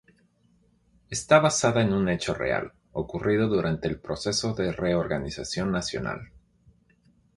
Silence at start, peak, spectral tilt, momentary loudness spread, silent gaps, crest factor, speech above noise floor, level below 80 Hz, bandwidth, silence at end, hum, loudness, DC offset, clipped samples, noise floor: 1.1 s; -4 dBFS; -5 dB/octave; 13 LU; none; 22 dB; 39 dB; -50 dBFS; 11.5 kHz; 1.1 s; none; -26 LUFS; under 0.1%; under 0.1%; -64 dBFS